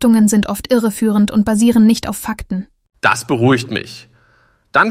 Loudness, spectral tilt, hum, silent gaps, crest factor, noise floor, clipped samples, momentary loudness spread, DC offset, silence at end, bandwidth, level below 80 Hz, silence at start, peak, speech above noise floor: -15 LUFS; -5 dB/octave; none; none; 14 dB; -55 dBFS; under 0.1%; 12 LU; under 0.1%; 0 s; 16 kHz; -42 dBFS; 0 s; -2 dBFS; 41 dB